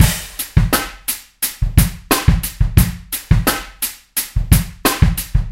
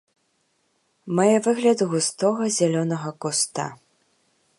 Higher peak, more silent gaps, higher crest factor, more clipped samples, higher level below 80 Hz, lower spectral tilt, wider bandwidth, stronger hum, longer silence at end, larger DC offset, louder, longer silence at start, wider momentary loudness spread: first, 0 dBFS vs -6 dBFS; neither; about the same, 16 dB vs 18 dB; first, 0.3% vs under 0.1%; first, -20 dBFS vs -74 dBFS; about the same, -4.5 dB/octave vs -4.5 dB/octave; first, 17 kHz vs 11.5 kHz; neither; second, 0 s vs 0.85 s; neither; first, -17 LUFS vs -22 LUFS; second, 0 s vs 1.05 s; about the same, 8 LU vs 9 LU